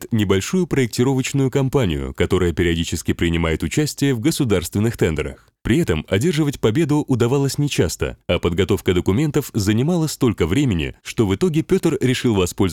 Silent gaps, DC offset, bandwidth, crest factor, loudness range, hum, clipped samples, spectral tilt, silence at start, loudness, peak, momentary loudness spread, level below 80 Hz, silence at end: none; 0.2%; 17.5 kHz; 14 dB; 1 LU; none; under 0.1%; -6 dB/octave; 0 s; -19 LUFS; -4 dBFS; 4 LU; -38 dBFS; 0 s